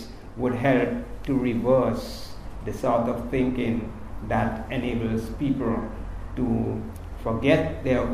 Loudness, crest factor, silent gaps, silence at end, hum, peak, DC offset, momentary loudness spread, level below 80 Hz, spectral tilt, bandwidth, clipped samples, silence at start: -26 LUFS; 20 dB; none; 0 s; none; -6 dBFS; under 0.1%; 15 LU; -38 dBFS; -7.5 dB/octave; 15 kHz; under 0.1%; 0 s